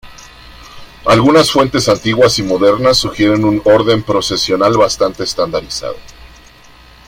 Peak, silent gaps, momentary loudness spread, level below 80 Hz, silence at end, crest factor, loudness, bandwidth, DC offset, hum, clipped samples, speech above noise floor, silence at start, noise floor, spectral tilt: 0 dBFS; none; 10 LU; -38 dBFS; 0.8 s; 14 dB; -12 LUFS; 16.5 kHz; under 0.1%; none; under 0.1%; 29 dB; 0.05 s; -41 dBFS; -4.5 dB/octave